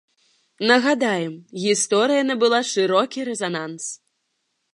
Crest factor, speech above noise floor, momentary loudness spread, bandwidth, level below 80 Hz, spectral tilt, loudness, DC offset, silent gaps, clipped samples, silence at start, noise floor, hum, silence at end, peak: 20 dB; 53 dB; 13 LU; 11.5 kHz; -78 dBFS; -3 dB/octave; -20 LUFS; under 0.1%; none; under 0.1%; 0.6 s; -74 dBFS; none; 0.8 s; -2 dBFS